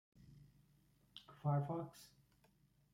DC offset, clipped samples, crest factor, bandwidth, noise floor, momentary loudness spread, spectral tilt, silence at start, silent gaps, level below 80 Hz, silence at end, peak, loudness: under 0.1%; under 0.1%; 20 dB; 15.5 kHz; -74 dBFS; 25 LU; -8 dB/octave; 0.3 s; none; -78 dBFS; 0.9 s; -28 dBFS; -43 LUFS